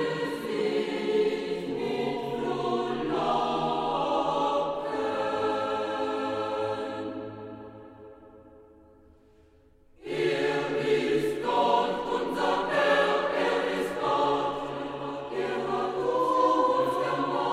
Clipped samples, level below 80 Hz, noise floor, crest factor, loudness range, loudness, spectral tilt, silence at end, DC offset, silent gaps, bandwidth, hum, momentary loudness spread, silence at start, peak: under 0.1%; -60 dBFS; -59 dBFS; 18 dB; 9 LU; -28 LUFS; -5 dB/octave; 0 s; under 0.1%; none; 14.5 kHz; none; 10 LU; 0 s; -10 dBFS